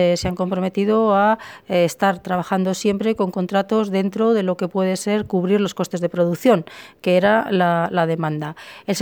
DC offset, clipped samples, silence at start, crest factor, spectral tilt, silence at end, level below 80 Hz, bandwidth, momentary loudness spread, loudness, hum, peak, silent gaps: under 0.1%; under 0.1%; 0 s; 16 dB; -6 dB/octave; 0 s; -52 dBFS; over 20 kHz; 7 LU; -19 LUFS; none; -4 dBFS; none